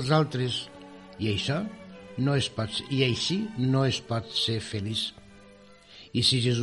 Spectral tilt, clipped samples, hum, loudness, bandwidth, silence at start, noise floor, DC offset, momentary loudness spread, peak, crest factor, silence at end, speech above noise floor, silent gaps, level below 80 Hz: -5 dB/octave; under 0.1%; none; -27 LUFS; 11.5 kHz; 0 s; -52 dBFS; under 0.1%; 12 LU; -10 dBFS; 20 dB; 0 s; 26 dB; none; -58 dBFS